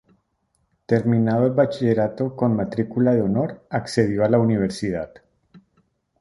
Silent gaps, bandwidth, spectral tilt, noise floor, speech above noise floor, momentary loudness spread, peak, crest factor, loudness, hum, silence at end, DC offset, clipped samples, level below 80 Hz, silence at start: none; 11.5 kHz; -8 dB/octave; -70 dBFS; 50 dB; 8 LU; -4 dBFS; 18 dB; -21 LUFS; none; 0.6 s; under 0.1%; under 0.1%; -52 dBFS; 0.9 s